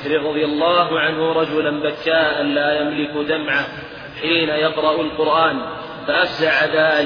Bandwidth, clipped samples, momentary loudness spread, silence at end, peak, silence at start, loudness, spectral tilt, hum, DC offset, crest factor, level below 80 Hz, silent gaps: 5.4 kHz; under 0.1%; 8 LU; 0 s; -4 dBFS; 0 s; -18 LUFS; -6 dB/octave; none; under 0.1%; 16 dB; -54 dBFS; none